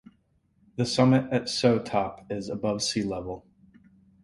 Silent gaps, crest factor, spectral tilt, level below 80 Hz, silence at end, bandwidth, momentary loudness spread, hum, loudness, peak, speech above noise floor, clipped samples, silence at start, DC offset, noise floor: none; 20 dB; -5.5 dB/octave; -58 dBFS; 0.85 s; 11.5 kHz; 14 LU; none; -26 LUFS; -8 dBFS; 42 dB; under 0.1%; 0.75 s; under 0.1%; -67 dBFS